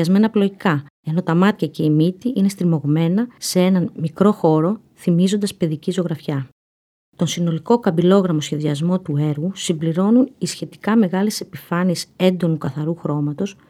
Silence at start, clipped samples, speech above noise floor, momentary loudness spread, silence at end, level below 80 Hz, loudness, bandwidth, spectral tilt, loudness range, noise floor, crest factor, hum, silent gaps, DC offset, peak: 0 s; under 0.1%; over 72 dB; 8 LU; 0.2 s; -64 dBFS; -19 LUFS; 15 kHz; -6.5 dB/octave; 2 LU; under -90 dBFS; 16 dB; none; 0.90-1.03 s, 6.52-7.12 s; under 0.1%; -2 dBFS